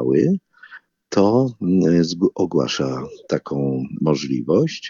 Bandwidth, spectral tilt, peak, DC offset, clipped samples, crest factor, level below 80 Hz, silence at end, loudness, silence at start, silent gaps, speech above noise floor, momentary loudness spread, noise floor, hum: 7.4 kHz; -6.5 dB/octave; -4 dBFS; under 0.1%; under 0.1%; 16 dB; -56 dBFS; 0 s; -20 LUFS; 0 s; none; 26 dB; 9 LU; -45 dBFS; none